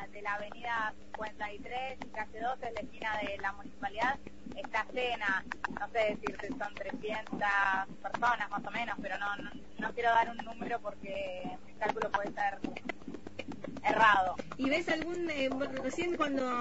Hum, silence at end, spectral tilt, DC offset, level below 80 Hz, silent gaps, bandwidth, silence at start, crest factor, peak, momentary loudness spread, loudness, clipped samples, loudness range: none; 0 s; -2 dB/octave; 0.5%; -60 dBFS; none; 7.6 kHz; 0 s; 22 dB; -12 dBFS; 12 LU; -34 LUFS; under 0.1%; 6 LU